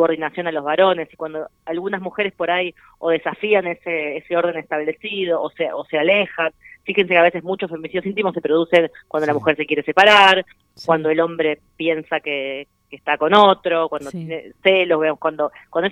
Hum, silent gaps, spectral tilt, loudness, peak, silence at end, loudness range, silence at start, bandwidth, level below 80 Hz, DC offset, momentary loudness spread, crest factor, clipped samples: none; none; -5 dB/octave; -18 LUFS; 0 dBFS; 0 s; 6 LU; 0 s; 12 kHz; -62 dBFS; under 0.1%; 14 LU; 18 dB; under 0.1%